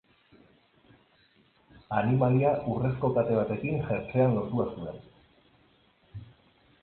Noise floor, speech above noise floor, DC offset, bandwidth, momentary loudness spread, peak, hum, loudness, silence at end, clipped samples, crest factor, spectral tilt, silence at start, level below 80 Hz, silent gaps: -64 dBFS; 37 dB; under 0.1%; 4.3 kHz; 23 LU; -12 dBFS; none; -28 LUFS; 0.6 s; under 0.1%; 18 dB; -12.5 dB/octave; 1.9 s; -58 dBFS; none